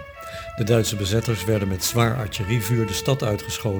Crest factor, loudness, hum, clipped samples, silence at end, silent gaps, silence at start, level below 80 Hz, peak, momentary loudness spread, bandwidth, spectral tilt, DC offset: 20 dB; -22 LUFS; none; under 0.1%; 0 s; none; 0 s; -44 dBFS; -4 dBFS; 7 LU; over 20 kHz; -5 dB/octave; under 0.1%